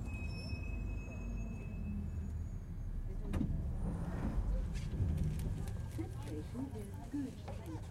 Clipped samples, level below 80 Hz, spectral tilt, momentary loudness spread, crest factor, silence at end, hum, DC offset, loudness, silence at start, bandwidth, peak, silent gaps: under 0.1%; -42 dBFS; -7.5 dB/octave; 7 LU; 16 dB; 0 s; none; under 0.1%; -42 LUFS; 0 s; 13.5 kHz; -24 dBFS; none